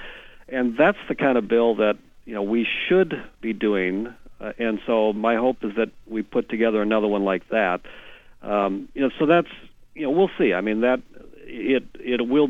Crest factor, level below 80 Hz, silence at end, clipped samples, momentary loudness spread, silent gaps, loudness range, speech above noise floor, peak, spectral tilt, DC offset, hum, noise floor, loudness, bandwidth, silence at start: 18 dB; -50 dBFS; 0 s; under 0.1%; 11 LU; none; 2 LU; 19 dB; -4 dBFS; -7.5 dB/octave; under 0.1%; none; -41 dBFS; -23 LUFS; 7.4 kHz; 0 s